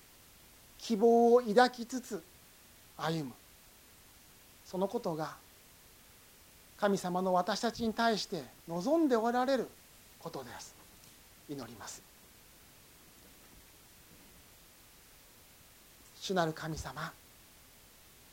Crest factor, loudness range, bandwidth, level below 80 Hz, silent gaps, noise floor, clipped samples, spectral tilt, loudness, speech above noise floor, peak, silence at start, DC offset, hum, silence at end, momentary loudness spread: 24 dB; 22 LU; 17 kHz; -66 dBFS; none; -59 dBFS; under 0.1%; -5 dB/octave; -33 LUFS; 27 dB; -12 dBFS; 0.8 s; under 0.1%; none; 1.2 s; 23 LU